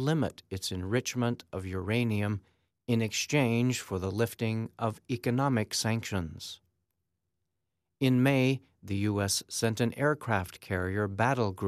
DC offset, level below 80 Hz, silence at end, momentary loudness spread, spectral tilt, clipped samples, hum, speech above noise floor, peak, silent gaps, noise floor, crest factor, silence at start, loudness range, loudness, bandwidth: under 0.1%; -62 dBFS; 0 s; 9 LU; -5 dB/octave; under 0.1%; none; 55 dB; -12 dBFS; none; -85 dBFS; 18 dB; 0 s; 3 LU; -30 LUFS; 14.5 kHz